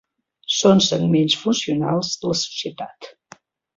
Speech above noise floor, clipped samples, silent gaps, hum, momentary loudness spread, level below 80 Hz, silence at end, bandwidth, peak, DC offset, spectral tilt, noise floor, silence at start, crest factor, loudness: 30 dB; under 0.1%; none; none; 16 LU; -60 dBFS; 0.65 s; 7.8 kHz; -4 dBFS; under 0.1%; -4.5 dB/octave; -49 dBFS; 0.5 s; 18 dB; -19 LUFS